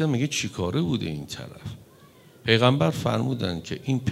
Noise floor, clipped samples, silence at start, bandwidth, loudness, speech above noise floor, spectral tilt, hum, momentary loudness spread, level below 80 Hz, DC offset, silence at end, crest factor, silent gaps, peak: -52 dBFS; under 0.1%; 0 s; 15.5 kHz; -25 LUFS; 27 dB; -5.5 dB/octave; none; 18 LU; -58 dBFS; under 0.1%; 0 s; 22 dB; none; -4 dBFS